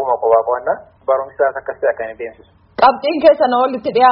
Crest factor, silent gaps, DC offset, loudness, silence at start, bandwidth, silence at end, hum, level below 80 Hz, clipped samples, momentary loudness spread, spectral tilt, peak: 16 dB; none; under 0.1%; -15 LUFS; 0 s; 5.6 kHz; 0 s; none; -54 dBFS; under 0.1%; 13 LU; -2 dB/octave; 0 dBFS